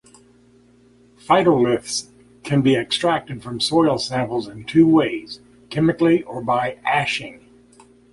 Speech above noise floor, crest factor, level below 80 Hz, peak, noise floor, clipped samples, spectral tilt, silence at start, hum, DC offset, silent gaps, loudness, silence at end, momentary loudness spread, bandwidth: 34 dB; 18 dB; -54 dBFS; -2 dBFS; -53 dBFS; under 0.1%; -5 dB/octave; 1.3 s; 60 Hz at -45 dBFS; under 0.1%; none; -19 LUFS; 0.75 s; 14 LU; 11.5 kHz